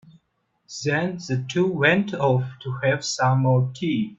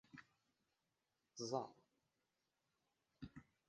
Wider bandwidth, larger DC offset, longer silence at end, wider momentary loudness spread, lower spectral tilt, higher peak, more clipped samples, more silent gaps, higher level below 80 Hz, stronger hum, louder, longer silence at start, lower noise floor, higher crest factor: second, 7.8 kHz vs 9.4 kHz; neither; second, 0.05 s vs 0.25 s; second, 8 LU vs 17 LU; about the same, -5.5 dB/octave vs -4.5 dB/octave; first, -4 dBFS vs -28 dBFS; neither; neither; first, -60 dBFS vs -80 dBFS; neither; first, -22 LUFS vs -50 LUFS; first, 0.7 s vs 0.15 s; second, -71 dBFS vs -89 dBFS; second, 18 dB vs 28 dB